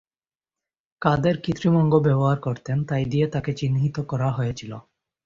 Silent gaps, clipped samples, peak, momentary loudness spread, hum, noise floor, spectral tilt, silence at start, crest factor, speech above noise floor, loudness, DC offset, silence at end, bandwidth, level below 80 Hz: none; under 0.1%; -4 dBFS; 9 LU; none; under -90 dBFS; -8 dB/octave; 1 s; 20 dB; over 68 dB; -23 LUFS; under 0.1%; 0.45 s; 7.4 kHz; -52 dBFS